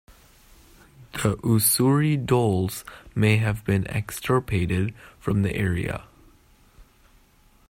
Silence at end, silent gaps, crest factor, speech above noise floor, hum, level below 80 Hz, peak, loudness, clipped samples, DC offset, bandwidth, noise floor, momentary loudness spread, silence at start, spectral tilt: 0.9 s; none; 18 dB; 35 dB; none; -48 dBFS; -8 dBFS; -23 LUFS; under 0.1%; under 0.1%; 16 kHz; -57 dBFS; 12 LU; 1 s; -5.5 dB/octave